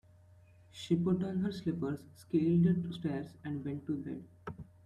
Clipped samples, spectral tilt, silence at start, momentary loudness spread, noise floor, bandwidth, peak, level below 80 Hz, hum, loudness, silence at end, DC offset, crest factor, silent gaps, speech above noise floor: under 0.1%; -8.5 dB/octave; 0.75 s; 19 LU; -61 dBFS; 10.5 kHz; -18 dBFS; -66 dBFS; none; -34 LUFS; 0.25 s; under 0.1%; 16 dB; none; 27 dB